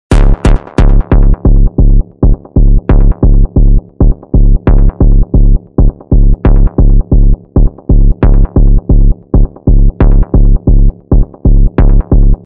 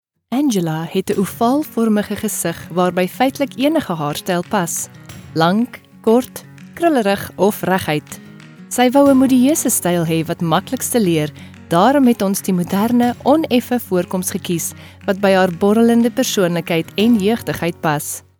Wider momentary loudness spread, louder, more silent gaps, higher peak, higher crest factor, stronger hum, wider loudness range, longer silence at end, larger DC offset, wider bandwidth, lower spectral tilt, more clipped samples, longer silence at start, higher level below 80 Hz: second, 3 LU vs 9 LU; first, -10 LUFS vs -17 LUFS; neither; about the same, 0 dBFS vs 0 dBFS; second, 6 dB vs 16 dB; neither; about the same, 1 LU vs 3 LU; about the same, 0.1 s vs 0.2 s; first, 1% vs under 0.1%; second, 3.2 kHz vs over 20 kHz; first, -9.5 dB/octave vs -5 dB/octave; neither; second, 0.1 s vs 0.3 s; first, -6 dBFS vs -54 dBFS